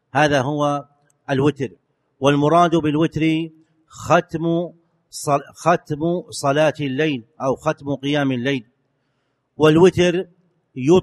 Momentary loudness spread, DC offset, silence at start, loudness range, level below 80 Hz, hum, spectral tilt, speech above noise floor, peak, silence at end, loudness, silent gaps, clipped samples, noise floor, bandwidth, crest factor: 13 LU; under 0.1%; 0.15 s; 3 LU; -52 dBFS; none; -6 dB/octave; 51 dB; 0 dBFS; 0 s; -19 LUFS; none; under 0.1%; -69 dBFS; 12.5 kHz; 18 dB